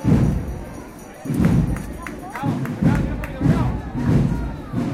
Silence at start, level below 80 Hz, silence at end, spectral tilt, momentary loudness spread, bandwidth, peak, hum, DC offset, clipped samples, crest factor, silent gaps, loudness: 0 s; -30 dBFS; 0 s; -8 dB/octave; 14 LU; 15.5 kHz; -8 dBFS; none; under 0.1%; under 0.1%; 12 dB; none; -22 LUFS